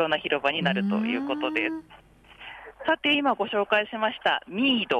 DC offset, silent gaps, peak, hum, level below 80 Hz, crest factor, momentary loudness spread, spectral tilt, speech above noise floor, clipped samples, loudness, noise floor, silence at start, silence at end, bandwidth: under 0.1%; none; -10 dBFS; none; -64 dBFS; 16 dB; 15 LU; -6 dB/octave; 21 dB; under 0.1%; -25 LUFS; -47 dBFS; 0 s; 0 s; 9.6 kHz